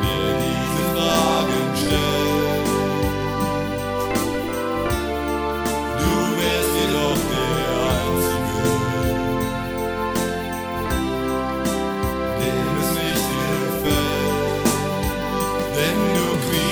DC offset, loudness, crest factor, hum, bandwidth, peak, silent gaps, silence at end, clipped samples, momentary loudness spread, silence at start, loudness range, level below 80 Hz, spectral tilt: under 0.1%; -21 LUFS; 16 dB; none; over 20 kHz; -4 dBFS; none; 0 s; under 0.1%; 4 LU; 0 s; 3 LU; -34 dBFS; -4.5 dB/octave